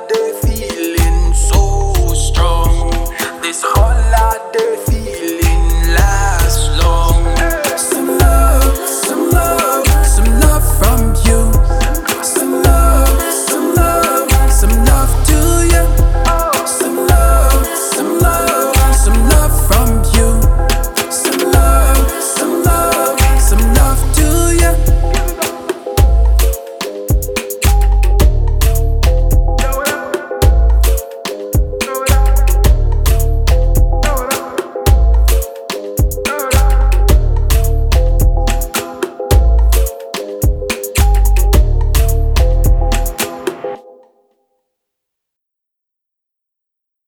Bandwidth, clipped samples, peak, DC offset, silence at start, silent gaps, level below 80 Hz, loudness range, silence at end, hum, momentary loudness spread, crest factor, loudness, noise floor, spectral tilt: 19 kHz; under 0.1%; 0 dBFS; under 0.1%; 0 s; none; -12 dBFS; 3 LU; 3.3 s; none; 7 LU; 10 dB; -13 LUFS; -80 dBFS; -4.5 dB/octave